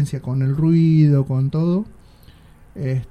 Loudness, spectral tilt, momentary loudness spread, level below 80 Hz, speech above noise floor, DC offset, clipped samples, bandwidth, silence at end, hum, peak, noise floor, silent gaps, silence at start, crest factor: -18 LUFS; -9.5 dB/octave; 11 LU; -46 dBFS; 29 dB; under 0.1%; under 0.1%; 9.6 kHz; 0.05 s; none; -4 dBFS; -46 dBFS; none; 0 s; 14 dB